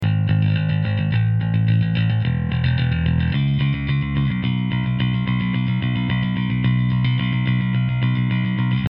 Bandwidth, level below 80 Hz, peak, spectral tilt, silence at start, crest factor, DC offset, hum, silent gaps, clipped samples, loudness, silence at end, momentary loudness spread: 5.2 kHz; -36 dBFS; -8 dBFS; -6.5 dB/octave; 0 s; 12 dB; under 0.1%; none; none; under 0.1%; -20 LUFS; 0.05 s; 3 LU